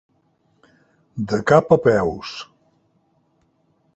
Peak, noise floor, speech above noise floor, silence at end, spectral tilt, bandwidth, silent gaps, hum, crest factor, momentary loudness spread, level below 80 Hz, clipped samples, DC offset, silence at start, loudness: -2 dBFS; -64 dBFS; 46 dB; 1.5 s; -6.5 dB/octave; 8.2 kHz; none; none; 20 dB; 21 LU; -52 dBFS; under 0.1%; under 0.1%; 1.15 s; -18 LUFS